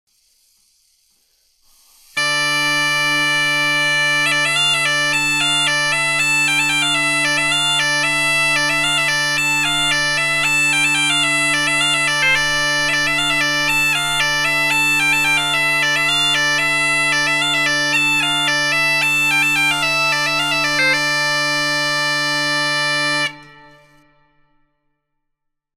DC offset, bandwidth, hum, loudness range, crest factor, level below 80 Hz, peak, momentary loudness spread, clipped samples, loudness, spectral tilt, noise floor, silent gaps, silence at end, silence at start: under 0.1%; 17.5 kHz; none; 4 LU; 14 dB; -46 dBFS; -4 dBFS; 3 LU; under 0.1%; -14 LUFS; -1 dB/octave; -75 dBFS; none; 2.3 s; 2.15 s